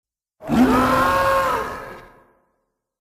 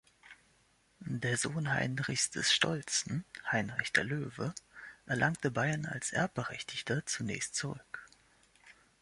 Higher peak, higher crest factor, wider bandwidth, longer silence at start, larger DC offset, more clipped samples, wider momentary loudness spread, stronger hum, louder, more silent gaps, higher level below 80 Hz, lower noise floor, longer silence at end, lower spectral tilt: first, -4 dBFS vs -12 dBFS; second, 16 dB vs 24 dB; first, 15.5 kHz vs 11.5 kHz; first, 0.4 s vs 0.25 s; neither; neither; first, 19 LU vs 12 LU; neither; first, -18 LUFS vs -34 LUFS; neither; first, -40 dBFS vs -66 dBFS; about the same, -73 dBFS vs -70 dBFS; first, 1 s vs 0.3 s; first, -5.5 dB/octave vs -3 dB/octave